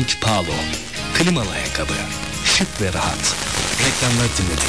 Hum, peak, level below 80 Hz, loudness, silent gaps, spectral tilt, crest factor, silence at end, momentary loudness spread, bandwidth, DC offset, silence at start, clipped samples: none; -2 dBFS; -34 dBFS; -19 LUFS; none; -3 dB/octave; 18 dB; 0 s; 6 LU; 11 kHz; 1%; 0 s; under 0.1%